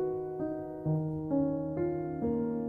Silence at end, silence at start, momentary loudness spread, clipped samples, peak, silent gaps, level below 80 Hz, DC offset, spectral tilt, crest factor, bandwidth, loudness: 0 s; 0 s; 5 LU; under 0.1%; -18 dBFS; none; -58 dBFS; under 0.1%; -12.5 dB/octave; 14 dB; 2.4 kHz; -33 LUFS